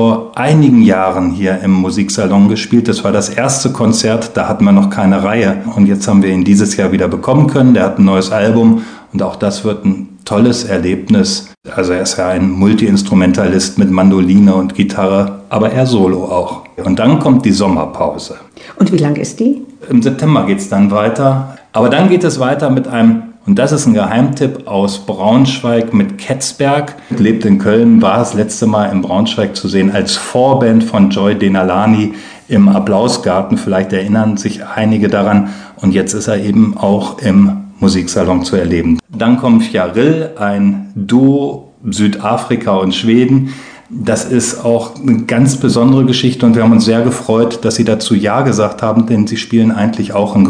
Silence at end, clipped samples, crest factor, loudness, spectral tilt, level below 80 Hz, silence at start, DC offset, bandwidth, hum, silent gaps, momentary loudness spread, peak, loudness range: 0 s; 0.7%; 10 dB; -11 LUFS; -6 dB/octave; -44 dBFS; 0 s; under 0.1%; 10 kHz; none; none; 7 LU; 0 dBFS; 3 LU